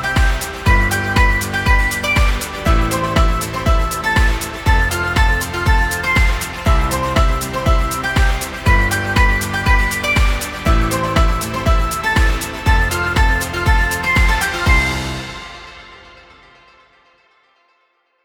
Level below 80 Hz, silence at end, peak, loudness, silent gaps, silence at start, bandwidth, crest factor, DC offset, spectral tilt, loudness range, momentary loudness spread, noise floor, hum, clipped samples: -18 dBFS; 2.25 s; 0 dBFS; -16 LUFS; none; 0 s; 18 kHz; 16 dB; under 0.1%; -4.5 dB/octave; 2 LU; 4 LU; -62 dBFS; none; under 0.1%